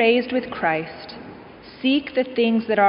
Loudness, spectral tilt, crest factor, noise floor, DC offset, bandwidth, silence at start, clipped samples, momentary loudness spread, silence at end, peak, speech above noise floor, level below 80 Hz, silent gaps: -22 LUFS; -2.5 dB/octave; 16 dB; -42 dBFS; under 0.1%; 5.4 kHz; 0 s; under 0.1%; 20 LU; 0 s; -4 dBFS; 22 dB; -58 dBFS; none